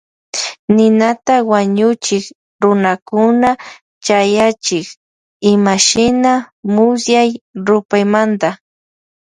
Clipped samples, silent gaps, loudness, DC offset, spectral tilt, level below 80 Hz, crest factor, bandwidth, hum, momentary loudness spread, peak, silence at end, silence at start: under 0.1%; 0.59-0.68 s, 2.35-2.59 s, 3.02-3.06 s, 3.81-4.01 s, 4.97-5.40 s, 6.52-6.63 s, 7.41-7.54 s, 7.85-7.89 s; -13 LUFS; under 0.1%; -4 dB/octave; -52 dBFS; 14 dB; 10.5 kHz; none; 10 LU; 0 dBFS; 0.7 s; 0.35 s